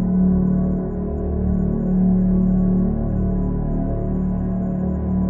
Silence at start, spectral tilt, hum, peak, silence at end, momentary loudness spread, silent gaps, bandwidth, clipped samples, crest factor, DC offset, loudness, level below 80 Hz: 0 s; -14 dB/octave; none; -8 dBFS; 0 s; 6 LU; none; 2 kHz; under 0.1%; 10 dB; under 0.1%; -20 LUFS; -26 dBFS